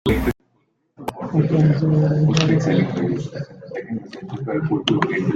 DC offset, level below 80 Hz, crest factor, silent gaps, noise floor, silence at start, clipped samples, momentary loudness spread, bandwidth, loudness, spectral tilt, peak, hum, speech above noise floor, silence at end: under 0.1%; -40 dBFS; 20 dB; none; -66 dBFS; 0.05 s; under 0.1%; 16 LU; 12.5 kHz; -20 LUFS; -7 dB/octave; 0 dBFS; none; 47 dB; 0 s